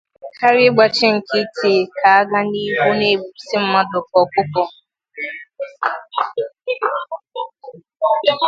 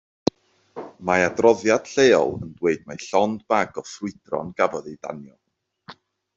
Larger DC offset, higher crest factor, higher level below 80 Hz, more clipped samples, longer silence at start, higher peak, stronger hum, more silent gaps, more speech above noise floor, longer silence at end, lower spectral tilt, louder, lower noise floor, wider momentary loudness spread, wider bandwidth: neither; about the same, 18 dB vs 20 dB; about the same, -64 dBFS vs -62 dBFS; neither; second, 0.25 s vs 0.75 s; about the same, 0 dBFS vs -2 dBFS; neither; neither; about the same, 24 dB vs 27 dB; second, 0 s vs 0.45 s; about the same, -5 dB/octave vs -4.5 dB/octave; first, -17 LUFS vs -22 LUFS; second, -39 dBFS vs -48 dBFS; second, 15 LU vs 18 LU; about the same, 7.8 kHz vs 7.8 kHz